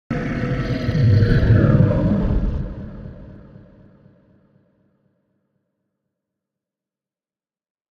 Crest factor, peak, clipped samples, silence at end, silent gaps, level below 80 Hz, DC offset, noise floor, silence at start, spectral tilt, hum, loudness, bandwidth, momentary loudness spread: 18 dB; -4 dBFS; under 0.1%; 4.5 s; none; -30 dBFS; under 0.1%; under -90 dBFS; 0.1 s; -9.5 dB/octave; none; -18 LUFS; 6.4 kHz; 20 LU